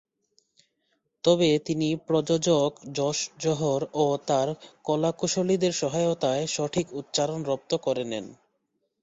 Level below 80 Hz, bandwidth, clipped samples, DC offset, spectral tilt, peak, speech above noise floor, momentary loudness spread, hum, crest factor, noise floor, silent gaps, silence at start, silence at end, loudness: -64 dBFS; 8.2 kHz; under 0.1%; under 0.1%; -5 dB/octave; -8 dBFS; 51 dB; 7 LU; none; 18 dB; -76 dBFS; none; 1.25 s; 0.7 s; -26 LUFS